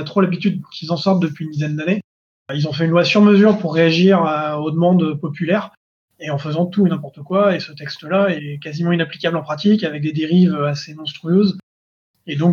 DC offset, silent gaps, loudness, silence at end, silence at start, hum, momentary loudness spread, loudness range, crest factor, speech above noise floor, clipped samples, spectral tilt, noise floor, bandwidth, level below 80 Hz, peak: under 0.1%; 2.04-2.46 s, 5.77-6.08 s, 11.63-12.14 s; -17 LUFS; 0 s; 0 s; none; 13 LU; 5 LU; 16 dB; over 73 dB; under 0.1%; -7.5 dB/octave; under -90 dBFS; 7 kHz; -68 dBFS; -2 dBFS